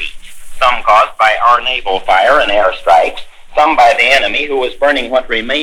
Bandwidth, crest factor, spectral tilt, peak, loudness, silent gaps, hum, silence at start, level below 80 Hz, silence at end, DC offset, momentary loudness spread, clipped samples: 15.5 kHz; 12 dB; -2 dB/octave; 0 dBFS; -11 LUFS; none; none; 0 s; -34 dBFS; 0 s; under 0.1%; 7 LU; 0.8%